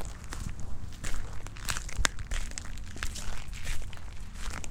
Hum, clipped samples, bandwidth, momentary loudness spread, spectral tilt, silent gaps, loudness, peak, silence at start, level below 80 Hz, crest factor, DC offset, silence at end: none; under 0.1%; 16 kHz; 12 LU; -2.5 dB/octave; none; -38 LUFS; 0 dBFS; 0 s; -36 dBFS; 30 dB; under 0.1%; 0 s